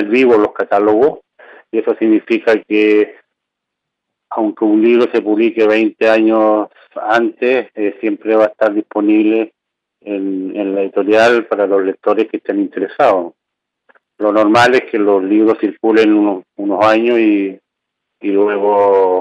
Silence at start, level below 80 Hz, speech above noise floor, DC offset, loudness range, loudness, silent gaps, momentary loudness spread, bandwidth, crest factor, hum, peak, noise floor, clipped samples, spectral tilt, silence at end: 0 s; -62 dBFS; 65 dB; under 0.1%; 3 LU; -13 LUFS; none; 9 LU; 8.8 kHz; 12 dB; none; -2 dBFS; -77 dBFS; under 0.1%; -6 dB/octave; 0 s